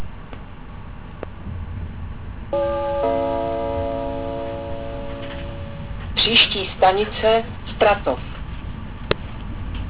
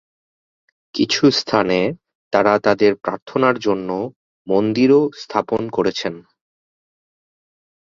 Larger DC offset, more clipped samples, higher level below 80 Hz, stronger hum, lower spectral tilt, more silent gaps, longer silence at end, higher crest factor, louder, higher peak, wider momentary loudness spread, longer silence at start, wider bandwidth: first, 0.9% vs under 0.1%; neither; first, -34 dBFS vs -58 dBFS; neither; first, -9 dB/octave vs -5.5 dB/octave; second, none vs 2.15-2.31 s, 3.22-3.26 s, 4.16-4.45 s; second, 0 s vs 1.65 s; about the same, 20 dB vs 18 dB; second, -21 LUFS vs -18 LUFS; about the same, -4 dBFS vs -2 dBFS; first, 18 LU vs 11 LU; second, 0 s vs 0.95 s; second, 4 kHz vs 7.6 kHz